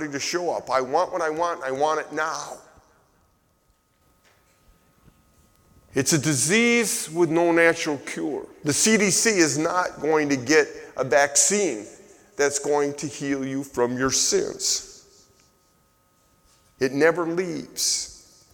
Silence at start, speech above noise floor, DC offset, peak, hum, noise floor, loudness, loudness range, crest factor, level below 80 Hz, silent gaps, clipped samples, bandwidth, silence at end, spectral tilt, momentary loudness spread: 0 s; 42 dB; under 0.1%; -4 dBFS; none; -65 dBFS; -22 LUFS; 9 LU; 20 dB; -60 dBFS; none; under 0.1%; 19 kHz; 0.35 s; -3 dB/octave; 12 LU